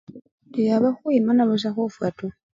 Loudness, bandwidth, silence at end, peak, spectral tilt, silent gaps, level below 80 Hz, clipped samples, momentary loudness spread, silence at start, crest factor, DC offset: -22 LUFS; 7.6 kHz; 0.25 s; -8 dBFS; -7.5 dB/octave; 0.32-0.38 s; -64 dBFS; under 0.1%; 10 LU; 0.1 s; 14 dB; under 0.1%